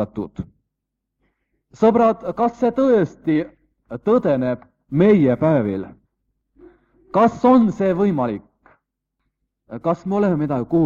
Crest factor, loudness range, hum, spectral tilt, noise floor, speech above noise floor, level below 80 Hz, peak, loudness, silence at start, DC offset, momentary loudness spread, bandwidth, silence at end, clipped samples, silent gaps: 16 dB; 2 LU; none; -9 dB/octave; -80 dBFS; 62 dB; -54 dBFS; -4 dBFS; -18 LUFS; 0 s; under 0.1%; 16 LU; 7.4 kHz; 0 s; under 0.1%; none